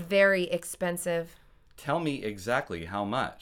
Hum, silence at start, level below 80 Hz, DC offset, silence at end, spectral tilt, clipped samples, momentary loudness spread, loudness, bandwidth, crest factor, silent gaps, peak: none; 0 s; -58 dBFS; under 0.1%; 0 s; -4.5 dB/octave; under 0.1%; 11 LU; -29 LUFS; 17.5 kHz; 20 dB; none; -10 dBFS